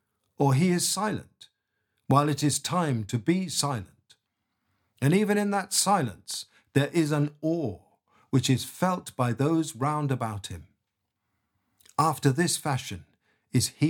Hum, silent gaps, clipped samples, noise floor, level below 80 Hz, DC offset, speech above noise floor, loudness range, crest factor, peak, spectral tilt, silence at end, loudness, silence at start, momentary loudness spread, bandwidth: none; none; under 0.1%; -81 dBFS; -64 dBFS; under 0.1%; 56 dB; 3 LU; 20 dB; -6 dBFS; -5 dB/octave; 0 s; -27 LUFS; 0.4 s; 12 LU; 19 kHz